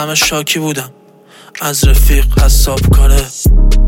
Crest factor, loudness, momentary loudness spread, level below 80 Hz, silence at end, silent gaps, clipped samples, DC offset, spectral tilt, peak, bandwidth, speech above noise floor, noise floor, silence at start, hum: 10 dB; -12 LUFS; 10 LU; -10 dBFS; 0 s; none; under 0.1%; under 0.1%; -4 dB/octave; 0 dBFS; 17 kHz; 31 dB; -40 dBFS; 0 s; none